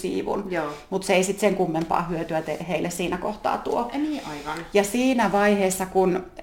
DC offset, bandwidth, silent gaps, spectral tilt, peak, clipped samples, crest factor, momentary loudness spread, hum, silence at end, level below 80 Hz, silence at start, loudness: under 0.1%; 17 kHz; none; -5 dB/octave; -4 dBFS; under 0.1%; 20 dB; 8 LU; none; 0 s; -50 dBFS; 0 s; -24 LUFS